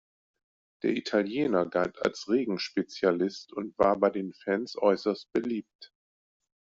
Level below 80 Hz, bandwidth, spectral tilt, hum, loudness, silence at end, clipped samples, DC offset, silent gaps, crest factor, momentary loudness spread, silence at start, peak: -66 dBFS; 7.8 kHz; -4 dB/octave; none; -29 LUFS; 0.85 s; under 0.1%; under 0.1%; 5.75-5.79 s; 20 dB; 7 LU; 0.85 s; -8 dBFS